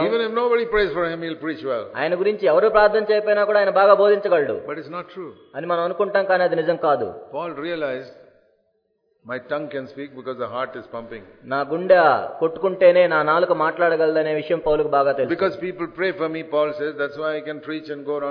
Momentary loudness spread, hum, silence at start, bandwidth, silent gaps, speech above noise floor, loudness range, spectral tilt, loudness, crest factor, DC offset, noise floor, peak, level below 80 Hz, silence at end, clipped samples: 16 LU; none; 0 s; 5.4 kHz; none; 48 dB; 12 LU; -8 dB/octave; -20 LUFS; 20 dB; under 0.1%; -68 dBFS; 0 dBFS; -52 dBFS; 0 s; under 0.1%